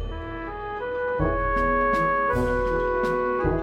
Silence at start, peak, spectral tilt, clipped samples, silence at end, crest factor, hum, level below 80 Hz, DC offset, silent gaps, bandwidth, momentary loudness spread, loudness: 0 s; -10 dBFS; -7.5 dB/octave; under 0.1%; 0 s; 14 dB; none; -34 dBFS; under 0.1%; none; 14 kHz; 11 LU; -24 LUFS